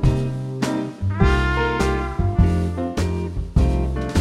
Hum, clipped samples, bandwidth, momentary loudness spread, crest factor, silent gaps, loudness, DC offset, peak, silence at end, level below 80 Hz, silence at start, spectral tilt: none; under 0.1%; 12 kHz; 6 LU; 16 dB; none; -21 LUFS; under 0.1%; -4 dBFS; 0 s; -24 dBFS; 0 s; -7 dB/octave